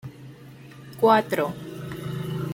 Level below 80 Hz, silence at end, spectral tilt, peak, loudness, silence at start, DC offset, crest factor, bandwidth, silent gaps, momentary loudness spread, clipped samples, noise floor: -60 dBFS; 0 s; -6.5 dB/octave; -4 dBFS; -24 LUFS; 0.05 s; under 0.1%; 22 dB; 17 kHz; none; 25 LU; under 0.1%; -45 dBFS